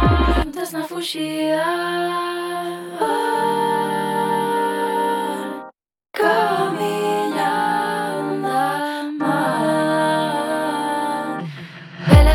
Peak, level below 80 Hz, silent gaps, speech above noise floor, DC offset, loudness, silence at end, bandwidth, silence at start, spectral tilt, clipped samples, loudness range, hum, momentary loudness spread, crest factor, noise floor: 0 dBFS; -28 dBFS; none; 24 dB; under 0.1%; -20 LUFS; 0 s; 17 kHz; 0 s; -6 dB/octave; under 0.1%; 1 LU; none; 8 LU; 20 dB; -46 dBFS